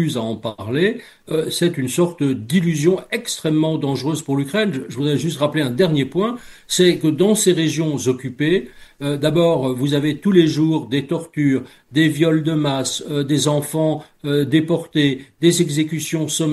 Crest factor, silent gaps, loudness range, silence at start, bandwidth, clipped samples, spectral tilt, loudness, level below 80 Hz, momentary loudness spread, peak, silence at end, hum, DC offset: 16 dB; none; 2 LU; 0 s; 12.5 kHz; under 0.1%; -5 dB/octave; -19 LUFS; -56 dBFS; 7 LU; -2 dBFS; 0 s; none; under 0.1%